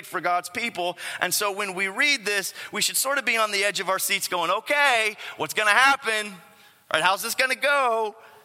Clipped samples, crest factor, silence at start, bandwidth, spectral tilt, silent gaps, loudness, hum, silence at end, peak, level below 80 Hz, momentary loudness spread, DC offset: under 0.1%; 22 dB; 0 s; 16.5 kHz; -0.5 dB/octave; none; -23 LUFS; none; 0.2 s; -2 dBFS; -80 dBFS; 9 LU; under 0.1%